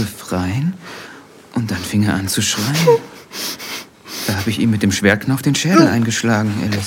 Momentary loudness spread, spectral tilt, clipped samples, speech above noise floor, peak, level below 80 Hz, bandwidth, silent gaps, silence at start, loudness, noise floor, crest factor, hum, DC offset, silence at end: 15 LU; -4.5 dB/octave; under 0.1%; 24 dB; 0 dBFS; -54 dBFS; 17 kHz; none; 0 s; -17 LUFS; -39 dBFS; 18 dB; none; under 0.1%; 0 s